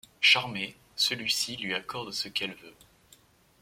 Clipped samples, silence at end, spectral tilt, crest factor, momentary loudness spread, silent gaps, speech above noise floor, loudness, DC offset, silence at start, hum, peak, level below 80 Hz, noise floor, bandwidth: under 0.1%; 0.9 s; -1 dB/octave; 24 dB; 15 LU; none; 30 dB; -27 LUFS; under 0.1%; 0.2 s; none; -8 dBFS; -68 dBFS; -61 dBFS; 16.5 kHz